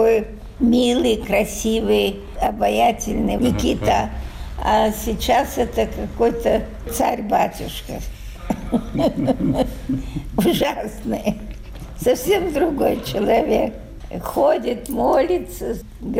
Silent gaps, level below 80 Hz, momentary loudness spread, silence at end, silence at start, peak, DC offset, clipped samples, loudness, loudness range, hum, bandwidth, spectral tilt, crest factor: none; -34 dBFS; 13 LU; 0 s; 0 s; -8 dBFS; under 0.1%; under 0.1%; -20 LUFS; 3 LU; none; 16 kHz; -5 dB/octave; 12 dB